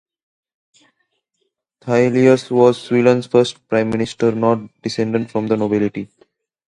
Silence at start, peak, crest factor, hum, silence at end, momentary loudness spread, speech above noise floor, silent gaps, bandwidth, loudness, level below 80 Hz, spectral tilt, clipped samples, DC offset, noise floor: 1.85 s; 0 dBFS; 18 dB; none; 0.6 s; 9 LU; 56 dB; none; 11 kHz; -17 LUFS; -56 dBFS; -6.5 dB/octave; under 0.1%; under 0.1%; -72 dBFS